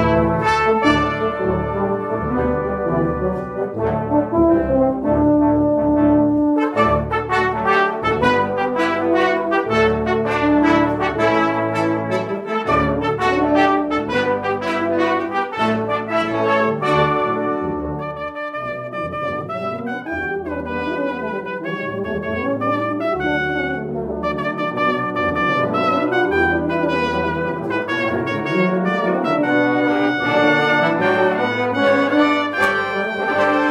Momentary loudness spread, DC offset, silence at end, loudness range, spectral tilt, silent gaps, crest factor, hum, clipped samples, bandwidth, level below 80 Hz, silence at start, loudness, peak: 8 LU; under 0.1%; 0 s; 6 LU; -7 dB/octave; none; 14 dB; none; under 0.1%; 11 kHz; -40 dBFS; 0 s; -18 LUFS; -4 dBFS